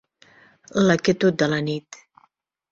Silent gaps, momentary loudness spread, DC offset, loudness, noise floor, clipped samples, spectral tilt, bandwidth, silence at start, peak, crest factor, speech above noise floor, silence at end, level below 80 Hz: none; 10 LU; under 0.1%; -21 LUFS; -64 dBFS; under 0.1%; -5.5 dB/octave; 7.8 kHz; 0.75 s; -4 dBFS; 18 dB; 44 dB; 0.9 s; -60 dBFS